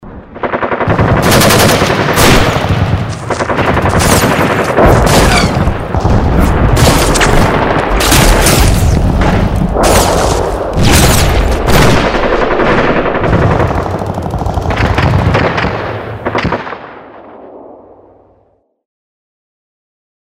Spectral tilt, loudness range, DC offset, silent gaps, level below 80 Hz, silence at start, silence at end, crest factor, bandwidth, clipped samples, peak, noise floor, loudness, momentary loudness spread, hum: -4.5 dB/octave; 6 LU; under 0.1%; none; -18 dBFS; 0 s; 2.45 s; 10 dB; 16.5 kHz; 0.4%; 0 dBFS; -53 dBFS; -10 LUFS; 9 LU; none